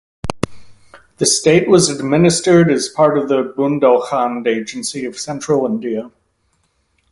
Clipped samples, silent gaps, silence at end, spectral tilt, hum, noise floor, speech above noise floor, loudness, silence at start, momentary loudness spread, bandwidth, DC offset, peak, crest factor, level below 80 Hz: under 0.1%; none; 1.05 s; -4.5 dB/octave; none; -63 dBFS; 49 dB; -15 LUFS; 0.25 s; 13 LU; 11.5 kHz; under 0.1%; 0 dBFS; 16 dB; -46 dBFS